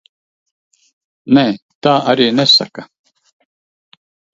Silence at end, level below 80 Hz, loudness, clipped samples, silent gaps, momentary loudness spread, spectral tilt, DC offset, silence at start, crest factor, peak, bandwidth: 1.5 s; -62 dBFS; -12 LUFS; under 0.1%; 1.62-1.69 s, 1.75-1.81 s; 19 LU; -5 dB/octave; under 0.1%; 1.25 s; 18 dB; 0 dBFS; 7.8 kHz